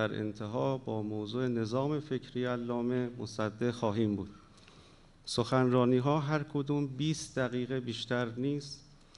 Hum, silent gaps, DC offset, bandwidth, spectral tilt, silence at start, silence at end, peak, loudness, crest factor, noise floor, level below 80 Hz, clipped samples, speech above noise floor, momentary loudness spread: none; none; under 0.1%; 11.5 kHz; -6.5 dB/octave; 0 s; 0.25 s; -14 dBFS; -33 LUFS; 18 dB; -58 dBFS; -62 dBFS; under 0.1%; 26 dB; 9 LU